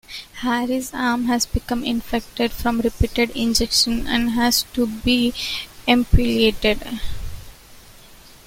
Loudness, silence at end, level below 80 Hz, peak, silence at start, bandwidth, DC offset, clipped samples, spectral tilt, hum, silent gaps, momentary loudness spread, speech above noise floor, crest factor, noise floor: -20 LUFS; 0.2 s; -30 dBFS; -2 dBFS; 0.1 s; 16.5 kHz; under 0.1%; under 0.1%; -4 dB/octave; none; none; 10 LU; 25 dB; 18 dB; -45 dBFS